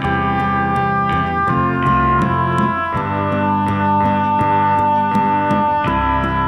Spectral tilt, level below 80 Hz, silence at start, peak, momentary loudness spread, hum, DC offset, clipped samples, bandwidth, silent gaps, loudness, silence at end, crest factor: -8 dB/octave; -34 dBFS; 0 s; -4 dBFS; 3 LU; none; under 0.1%; under 0.1%; 11 kHz; none; -16 LUFS; 0 s; 12 dB